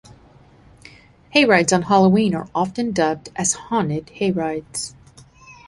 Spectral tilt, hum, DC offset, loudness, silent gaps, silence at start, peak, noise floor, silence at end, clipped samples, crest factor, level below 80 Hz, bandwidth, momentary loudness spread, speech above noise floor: -4.5 dB/octave; none; under 0.1%; -19 LUFS; none; 1.35 s; -2 dBFS; -49 dBFS; 0.15 s; under 0.1%; 20 dB; -54 dBFS; 11.5 kHz; 11 LU; 31 dB